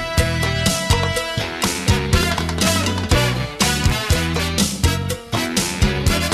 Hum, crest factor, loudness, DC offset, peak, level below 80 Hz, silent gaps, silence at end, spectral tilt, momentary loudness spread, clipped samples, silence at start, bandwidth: none; 14 dB; -19 LUFS; under 0.1%; -4 dBFS; -26 dBFS; none; 0 s; -4 dB/octave; 3 LU; under 0.1%; 0 s; 14 kHz